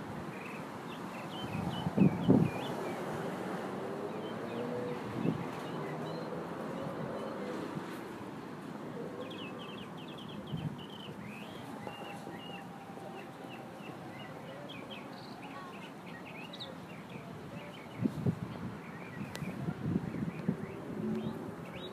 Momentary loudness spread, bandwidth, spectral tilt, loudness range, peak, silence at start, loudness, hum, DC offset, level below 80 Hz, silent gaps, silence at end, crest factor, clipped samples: 10 LU; 15.5 kHz; -7 dB/octave; 12 LU; -12 dBFS; 0 s; -39 LUFS; none; under 0.1%; -66 dBFS; none; 0 s; 26 dB; under 0.1%